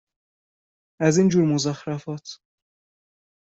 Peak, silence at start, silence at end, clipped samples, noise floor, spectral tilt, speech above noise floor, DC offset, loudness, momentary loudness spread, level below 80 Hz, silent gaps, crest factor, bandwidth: -6 dBFS; 1 s; 1.1 s; under 0.1%; under -90 dBFS; -6 dB/octave; over 69 dB; under 0.1%; -22 LUFS; 17 LU; -64 dBFS; none; 20 dB; 8 kHz